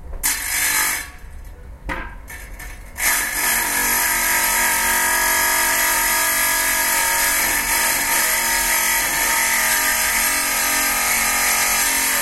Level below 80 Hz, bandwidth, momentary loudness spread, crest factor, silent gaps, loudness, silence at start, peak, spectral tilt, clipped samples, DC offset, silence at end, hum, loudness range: -38 dBFS; 16 kHz; 14 LU; 16 dB; none; -16 LUFS; 0 s; -4 dBFS; 0.5 dB/octave; under 0.1%; under 0.1%; 0 s; none; 6 LU